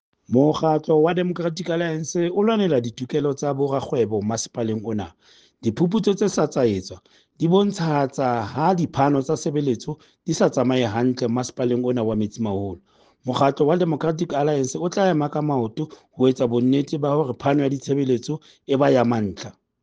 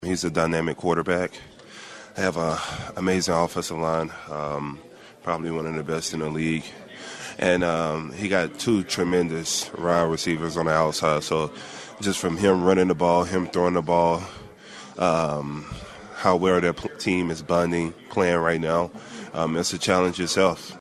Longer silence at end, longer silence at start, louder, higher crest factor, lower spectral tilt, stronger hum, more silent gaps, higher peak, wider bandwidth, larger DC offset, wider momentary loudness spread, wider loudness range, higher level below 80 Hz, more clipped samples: first, 0.3 s vs 0 s; first, 0.3 s vs 0 s; about the same, -22 LUFS vs -24 LUFS; about the same, 18 dB vs 20 dB; first, -6.5 dB/octave vs -4.5 dB/octave; neither; neither; about the same, -4 dBFS vs -4 dBFS; second, 9.6 kHz vs 13 kHz; neither; second, 9 LU vs 16 LU; about the same, 2 LU vs 4 LU; second, -58 dBFS vs -52 dBFS; neither